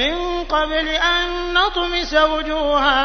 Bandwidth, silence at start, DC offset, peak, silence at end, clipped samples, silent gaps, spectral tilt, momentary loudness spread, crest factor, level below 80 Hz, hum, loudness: 6.6 kHz; 0 s; 0.2%; -2 dBFS; 0 s; under 0.1%; none; -3 dB/octave; 4 LU; 16 dB; -32 dBFS; none; -18 LUFS